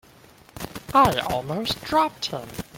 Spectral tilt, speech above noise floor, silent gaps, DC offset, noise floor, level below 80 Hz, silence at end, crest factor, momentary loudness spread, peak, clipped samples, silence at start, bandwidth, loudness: -4.5 dB/octave; 29 dB; none; under 0.1%; -51 dBFS; -48 dBFS; 0 s; 20 dB; 18 LU; -4 dBFS; under 0.1%; 0.55 s; 17 kHz; -23 LUFS